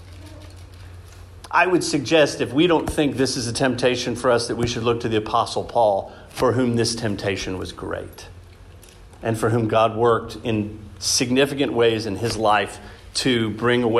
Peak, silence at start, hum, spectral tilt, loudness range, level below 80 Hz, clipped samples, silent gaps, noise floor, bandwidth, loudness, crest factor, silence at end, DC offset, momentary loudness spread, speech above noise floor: -4 dBFS; 0 s; none; -4.5 dB/octave; 5 LU; -46 dBFS; under 0.1%; none; -44 dBFS; 14 kHz; -21 LUFS; 18 dB; 0 s; under 0.1%; 13 LU; 23 dB